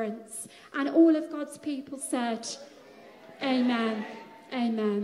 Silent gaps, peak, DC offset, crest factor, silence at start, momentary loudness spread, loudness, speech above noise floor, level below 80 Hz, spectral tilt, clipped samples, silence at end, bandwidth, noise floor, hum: none; -10 dBFS; under 0.1%; 18 dB; 0 s; 18 LU; -29 LUFS; 23 dB; -82 dBFS; -4.5 dB/octave; under 0.1%; 0 s; 13 kHz; -51 dBFS; none